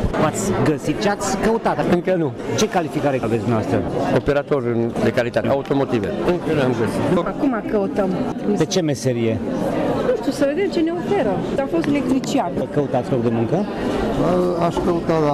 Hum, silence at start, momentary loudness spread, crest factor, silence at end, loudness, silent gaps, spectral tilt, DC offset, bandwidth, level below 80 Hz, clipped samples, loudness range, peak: none; 0 s; 3 LU; 10 dB; 0 s; -20 LUFS; none; -6 dB/octave; under 0.1%; 15.5 kHz; -40 dBFS; under 0.1%; 1 LU; -8 dBFS